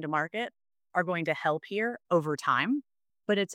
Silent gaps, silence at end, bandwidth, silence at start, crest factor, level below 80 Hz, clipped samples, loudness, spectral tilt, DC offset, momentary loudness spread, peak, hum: none; 0 s; 15 kHz; 0 s; 18 dB; -82 dBFS; under 0.1%; -30 LUFS; -5.5 dB/octave; under 0.1%; 7 LU; -12 dBFS; none